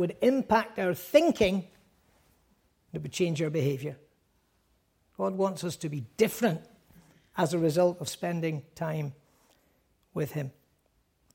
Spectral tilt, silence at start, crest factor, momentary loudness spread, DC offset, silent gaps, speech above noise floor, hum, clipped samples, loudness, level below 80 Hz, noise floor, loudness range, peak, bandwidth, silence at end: -6 dB/octave; 0 s; 22 dB; 14 LU; under 0.1%; none; 43 dB; none; under 0.1%; -29 LUFS; -60 dBFS; -71 dBFS; 6 LU; -8 dBFS; 16.5 kHz; 0.85 s